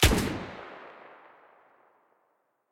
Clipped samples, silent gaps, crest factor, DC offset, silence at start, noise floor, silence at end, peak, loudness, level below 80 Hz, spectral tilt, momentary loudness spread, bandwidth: under 0.1%; none; 26 dB; under 0.1%; 0 s; -73 dBFS; 1.8 s; -6 dBFS; -30 LUFS; -38 dBFS; -4 dB/octave; 25 LU; 16.5 kHz